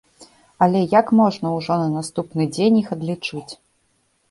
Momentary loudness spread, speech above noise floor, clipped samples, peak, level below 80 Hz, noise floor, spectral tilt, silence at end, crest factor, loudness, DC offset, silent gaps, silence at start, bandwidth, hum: 12 LU; 46 dB; under 0.1%; -2 dBFS; -60 dBFS; -65 dBFS; -6.5 dB/octave; 0.75 s; 18 dB; -19 LUFS; under 0.1%; none; 0.2 s; 11.5 kHz; none